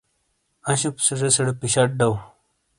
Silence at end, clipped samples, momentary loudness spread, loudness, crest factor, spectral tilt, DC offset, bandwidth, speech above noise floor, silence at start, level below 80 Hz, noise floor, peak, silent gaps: 0.55 s; under 0.1%; 7 LU; -21 LUFS; 22 dB; -3.5 dB/octave; under 0.1%; 11.5 kHz; 49 dB; 0.65 s; -54 dBFS; -70 dBFS; -2 dBFS; none